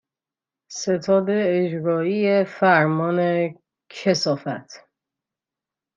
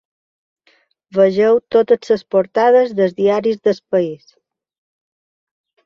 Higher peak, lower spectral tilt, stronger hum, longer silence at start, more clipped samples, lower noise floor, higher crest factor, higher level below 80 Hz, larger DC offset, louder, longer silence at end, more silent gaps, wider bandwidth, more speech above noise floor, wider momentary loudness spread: about the same, -4 dBFS vs -2 dBFS; second, -5.5 dB/octave vs -7 dB/octave; neither; second, 0.7 s vs 1.15 s; neither; first, -89 dBFS vs -58 dBFS; about the same, 18 dB vs 16 dB; second, -72 dBFS vs -62 dBFS; neither; second, -21 LUFS vs -15 LUFS; second, 1.2 s vs 1.7 s; neither; about the same, 7.6 kHz vs 7.2 kHz; first, 69 dB vs 44 dB; first, 12 LU vs 6 LU